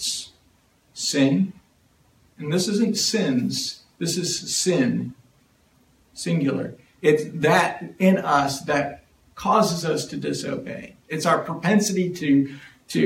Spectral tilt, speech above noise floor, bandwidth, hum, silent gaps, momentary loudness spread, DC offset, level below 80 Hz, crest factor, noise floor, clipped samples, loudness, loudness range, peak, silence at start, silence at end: -4.5 dB/octave; 38 dB; 16.5 kHz; none; none; 12 LU; under 0.1%; -60 dBFS; 20 dB; -60 dBFS; under 0.1%; -23 LUFS; 3 LU; -2 dBFS; 0 s; 0 s